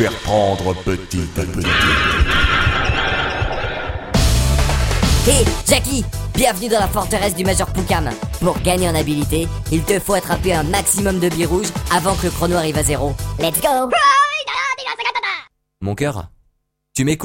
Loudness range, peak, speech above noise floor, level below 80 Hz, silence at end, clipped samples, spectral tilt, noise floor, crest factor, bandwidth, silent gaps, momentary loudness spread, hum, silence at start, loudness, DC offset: 2 LU; 0 dBFS; 47 dB; -24 dBFS; 0 s; under 0.1%; -4 dB/octave; -64 dBFS; 18 dB; 16.5 kHz; none; 8 LU; none; 0 s; -17 LUFS; under 0.1%